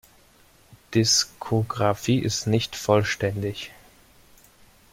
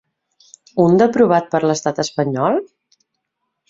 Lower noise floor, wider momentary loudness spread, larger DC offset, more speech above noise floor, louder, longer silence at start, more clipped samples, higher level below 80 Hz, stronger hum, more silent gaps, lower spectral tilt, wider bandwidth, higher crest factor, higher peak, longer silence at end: second, -56 dBFS vs -75 dBFS; first, 11 LU vs 8 LU; neither; second, 33 dB vs 60 dB; second, -23 LUFS vs -16 LUFS; about the same, 0.7 s vs 0.75 s; neither; about the same, -54 dBFS vs -58 dBFS; neither; neither; second, -4 dB/octave vs -6 dB/octave; first, 16.5 kHz vs 7.8 kHz; about the same, 20 dB vs 16 dB; second, -6 dBFS vs -2 dBFS; first, 1.25 s vs 1.05 s